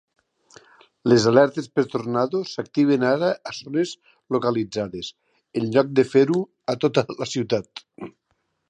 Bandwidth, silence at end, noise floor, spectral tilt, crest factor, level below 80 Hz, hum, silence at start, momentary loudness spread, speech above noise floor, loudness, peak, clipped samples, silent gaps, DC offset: 9.6 kHz; 0.6 s; -72 dBFS; -6 dB/octave; 20 dB; -64 dBFS; none; 1.05 s; 15 LU; 51 dB; -22 LUFS; -2 dBFS; under 0.1%; none; under 0.1%